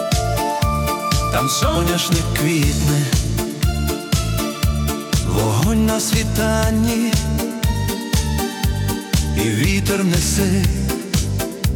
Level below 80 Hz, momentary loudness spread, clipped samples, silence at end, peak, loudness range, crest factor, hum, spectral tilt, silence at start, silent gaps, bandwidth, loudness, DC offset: -26 dBFS; 4 LU; under 0.1%; 0 s; -4 dBFS; 1 LU; 14 dB; none; -5 dB/octave; 0 s; none; 18 kHz; -18 LUFS; under 0.1%